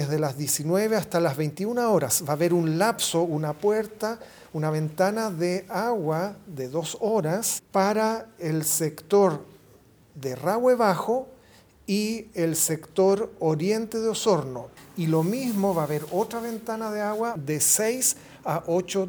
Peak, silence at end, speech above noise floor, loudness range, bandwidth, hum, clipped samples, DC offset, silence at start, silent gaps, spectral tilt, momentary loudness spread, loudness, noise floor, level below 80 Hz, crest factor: -6 dBFS; 0 s; 30 dB; 3 LU; over 20 kHz; none; under 0.1%; under 0.1%; 0 s; none; -4.5 dB/octave; 10 LU; -25 LUFS; -55 dBFS; -64 dBFS; 18 dB